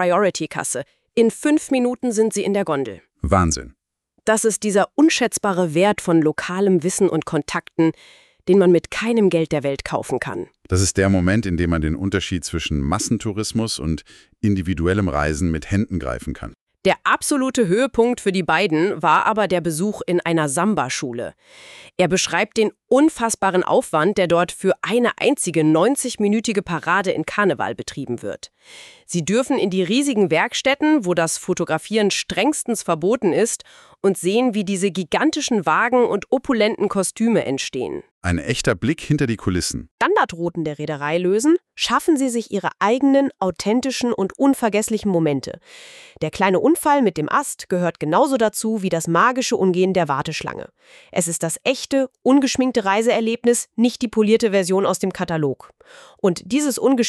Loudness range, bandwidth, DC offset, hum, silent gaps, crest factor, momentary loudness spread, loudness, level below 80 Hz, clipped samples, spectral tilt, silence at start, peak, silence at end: 3 LU; 13.5 kHz; under 0.1%; none; 16.61-16.67 s, 38.11-38.21 s, 39.91-39.98 s; 16 dB; 8 LU; -19 LUFS; -42 dBFS; under 0.1%; -4.5 dB/octave; 0 s; -2 dBFS; 0 s